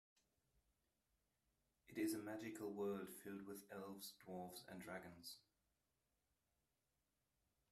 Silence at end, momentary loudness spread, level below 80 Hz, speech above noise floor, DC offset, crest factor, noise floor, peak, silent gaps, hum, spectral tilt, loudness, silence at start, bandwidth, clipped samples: 2.3 s; 10 LU; -88 dBFS; 39 dB; under 0.1%; 20 dB; -90 dBFS; -34 dBFS; none; none; -4.5 dB/octave; -52 LUFS; 1.9 s; 15.5 kHz; under 0.1%